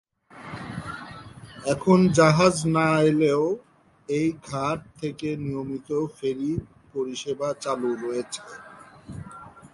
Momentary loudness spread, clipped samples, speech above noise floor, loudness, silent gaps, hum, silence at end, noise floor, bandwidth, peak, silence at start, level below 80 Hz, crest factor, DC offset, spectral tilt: 22 LU; under 0.1%; 21 dB; -24 LUFS; none; none; 0.05 s; -44 dBFS; 11.5 kHz; -4 dBFS; 0.35 s; -54 dBFS; 22 dB; under 0.1%; -6 dB/octave